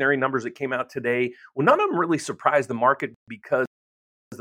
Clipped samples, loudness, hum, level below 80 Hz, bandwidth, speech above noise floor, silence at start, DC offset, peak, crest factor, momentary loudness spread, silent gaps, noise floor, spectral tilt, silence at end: under 0.1%; -24 LUFS; none; -76 dBFS; 16 kHz; over 67 dB; 0 s; under 0.1%; -2 dBFS; 22 dB; 8 LU; 3.16-3.27 s, 3.67-4.31 s; under -90 dBFS; -5.5 dB/octave; 0 s